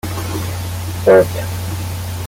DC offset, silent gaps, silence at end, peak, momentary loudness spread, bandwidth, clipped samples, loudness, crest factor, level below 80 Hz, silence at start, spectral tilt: under 0.1%; none; 0 s; -2 dBFS; 13 LU; 17 kHz; under 0.1%; -17 LUFS; 16 dB; -40 dBFS; 0.05 s; -5.5 dB/octave